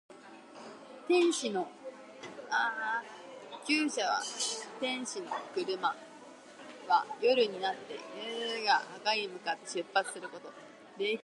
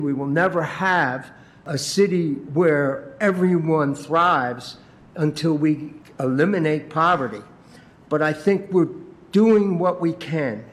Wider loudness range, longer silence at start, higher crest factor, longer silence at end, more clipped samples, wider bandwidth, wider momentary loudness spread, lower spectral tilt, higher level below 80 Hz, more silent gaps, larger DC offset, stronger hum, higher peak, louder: about the same, 2 LU vs 2 LU; about the same, 0.1 s vs 0 s; first, 20 dB vs 14 dB; about the same, 0 s vs 0 s; neither; second, 11.5 kHz vs 13.5 kHz; first, 21 LU vs 11 LU; second, -2 dB/octave vs -6.5 dB/octave; second, under -90 dBFS vs -62 dBFS; neither; neither; neither; second, -14 dBFS vs -6 dBFS; second, -33 LUFS vs -21 LUFS